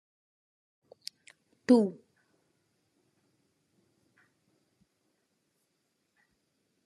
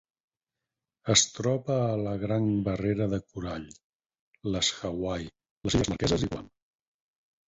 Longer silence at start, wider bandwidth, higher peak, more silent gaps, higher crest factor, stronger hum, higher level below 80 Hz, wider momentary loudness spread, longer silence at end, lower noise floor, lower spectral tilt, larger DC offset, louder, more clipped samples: first, 1.7 s vs 1.05 s; first, 12 kHz vs 8.4 kHz; second, -10 dBFS vs -6 dBFS; second, none vs 3.84-3.99 s, 4.19-4.32 s, 5.51-5.61 s; about the same, 26 dB vs 24 dB; neither; second, under -90 dBFS vs -48 dBFS; first, 22 LU vs 15 LU; first, 4.95 s vs 1 s; second, -79 dBFS vs -89 dBFS; first, -6.5 dB/octave vs -4 dB/octave; neither; about the same, -26 LUFS vs -28 LUFS; neither